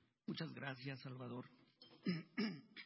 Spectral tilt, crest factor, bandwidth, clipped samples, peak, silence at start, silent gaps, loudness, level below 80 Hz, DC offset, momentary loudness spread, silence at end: -5 dB/octave; 18 dB; 5.6 kHz; under 0.1%; -30 dBFS; 0.3 s; none; -48 LUFS; -88 dBFS; under 0.1%; 14 LU; 0 s